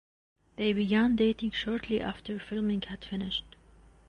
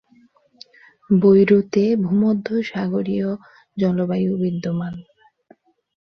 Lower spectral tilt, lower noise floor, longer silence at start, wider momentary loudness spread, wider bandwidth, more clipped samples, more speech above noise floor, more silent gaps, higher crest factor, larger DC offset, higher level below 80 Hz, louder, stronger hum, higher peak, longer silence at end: second, -7 dB/octave vs -9 dB/octave; about the same, -58 dBFS vs -56 dBFS; second, 0.6 s vs 1.1 s; about the same, 11 LU vs 13 LU; first, 8.6 kHz vs 6.2 kHz; neither; second, 28 dB vs 37 dB; neither; about the same, 14 dB vs 16 dB; neither; first, -54 dBFS vs -60 dBFS; second, -30 LUFS vs -19 LUFS; neither; second, -16 dBFS vs -4 dBFS; second, 0.6 s vs 1.05 s